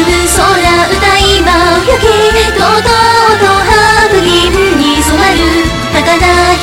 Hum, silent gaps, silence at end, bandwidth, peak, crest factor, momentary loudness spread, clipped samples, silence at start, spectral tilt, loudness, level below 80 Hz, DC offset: none; none; 0 s; 17 kHz; 0 dBFS; 8 dB; 2 LU; 0.4%; 0 s; -3.5 dB/octave; -7 LUFS; -20 dBFS; under 0.1%